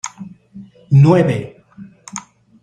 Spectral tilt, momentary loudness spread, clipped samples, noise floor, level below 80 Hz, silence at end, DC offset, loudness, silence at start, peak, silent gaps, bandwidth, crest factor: -7.5 dB/octave; 25 LU; under 0.1%; -40 dBFS; -54 dBFS; 0.45 s; under 0.1%; -13 LUFS; 0.05 s; -2 dBFS; none; 9.2 kHz; 16 dB